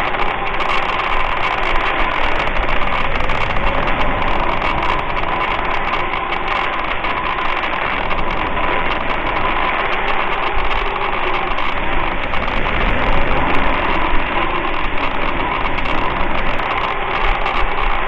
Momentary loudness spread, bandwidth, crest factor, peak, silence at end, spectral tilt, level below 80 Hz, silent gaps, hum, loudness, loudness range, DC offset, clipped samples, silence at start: 2 LU; 5.8 kHz; 16 dB; 0 dBFS; 0 s; -6 dB/octave; -22 dBFS; none; none; -18 LUFS; 1 LU; under 0.1%; under 0.1%; 0 s